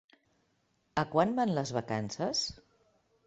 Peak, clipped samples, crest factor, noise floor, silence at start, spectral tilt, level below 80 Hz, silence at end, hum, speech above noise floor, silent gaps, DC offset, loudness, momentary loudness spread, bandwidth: -12 dBFS; under 0.1%; 24 dB; -75 dBFS; 0.95 s; -4.5 dB/octave; -64 dBFS; 0.75 s; none; 43 dB; none; under 0.1%; -32 LUFS; 8 LU; 8.2 kHz